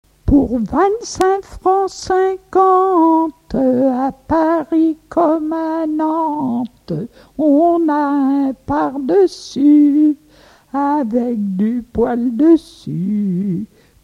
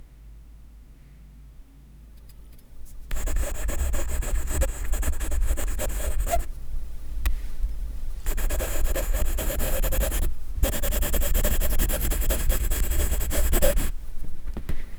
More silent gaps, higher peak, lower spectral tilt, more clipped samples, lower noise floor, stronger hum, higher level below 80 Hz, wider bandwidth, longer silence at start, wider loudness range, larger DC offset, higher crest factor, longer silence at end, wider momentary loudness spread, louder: neither; first, 0 dBFS vs -6 dBFS; first, -7 dB/octave vs -4 dB/octave; neither; about the same, -47 dBFS vs -47 dBFS; neither; second, -38 dBFS vs -26 dBFS; second, 11 kHz vs over 20 kHz; first, 0.25 s vs 0 s; second, 3 LU vs 8 LU; neither; about the same, 16 dB vs 18 dB; first, 0.4 s vs 0 s; second, 9 LU vs 14 LU; first, -16 LUFS vs -29 LUFS